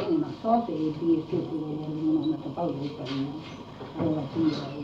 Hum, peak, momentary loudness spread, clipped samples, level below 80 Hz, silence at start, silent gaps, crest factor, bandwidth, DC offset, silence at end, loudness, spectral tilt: none; -12 dBFS; 9 LU; under 0.1%; -60 dBFS; 0 s; none; 16 dB; 7.2 kHz; under 0.1%; 0 s; -29 LUFS; -8.5 dB/octave